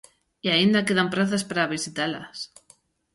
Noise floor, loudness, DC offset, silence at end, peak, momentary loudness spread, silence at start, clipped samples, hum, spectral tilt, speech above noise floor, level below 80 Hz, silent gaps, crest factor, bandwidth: -59 dBFS; -23 LUFS; under 0.1%; 0.7 s; -8 dBFS; 16 LU; 0.45 s; under 0.1%; none; -4 dB/octave; 35 dB; -64 dBFS; none; 18 dB; 11.5 kHz